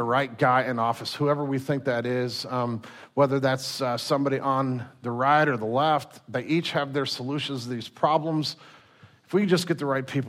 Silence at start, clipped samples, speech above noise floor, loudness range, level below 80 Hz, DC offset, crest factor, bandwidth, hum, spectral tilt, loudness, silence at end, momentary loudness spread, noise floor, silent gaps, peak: 0 s; under 0.1%; 29 dB; 2 LU; -72 dBFS; under 0.1%; 18 dB; 15.5 kHz; none; -5.5 dB/octave; -26 LUFS; 0 s; 10 LU; -55 dBFS; none; -8 dBFS